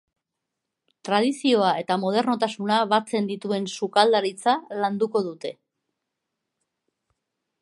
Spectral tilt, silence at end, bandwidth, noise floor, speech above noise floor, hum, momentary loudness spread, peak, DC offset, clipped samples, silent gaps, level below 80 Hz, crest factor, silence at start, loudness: -4.5 dB/octave; 2.1 s; 11.5 kHz; -83 dBFS; 60 dB; none; 7 LU; -4 dBFS; under 0.1%; under 0.1%; none; -78 dBFS; 22 dB; 1.05 s; -23 LUFS